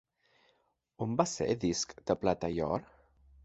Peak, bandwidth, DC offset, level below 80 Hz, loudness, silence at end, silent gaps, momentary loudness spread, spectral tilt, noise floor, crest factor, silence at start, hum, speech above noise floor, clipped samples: -12 dBFS; 8.4 kHz; under 0.1%; -58 dBFS; -33 LUFS; 0.6 s; none; 4 LU; -5 dB/octave; -75 dBFS; 24 dB; 1 s; none; 42 dB; under 0.1%